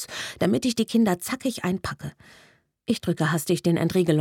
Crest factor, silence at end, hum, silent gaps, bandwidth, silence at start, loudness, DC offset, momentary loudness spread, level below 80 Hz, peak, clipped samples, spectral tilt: 18 dB; 0 s; none; none; 18.5 kHz; 0 s; -25 LUFS; under 0.1%; 11 LU; -56 dBFS; -8 dBFS; under 0.1%; -5.5 dB/octave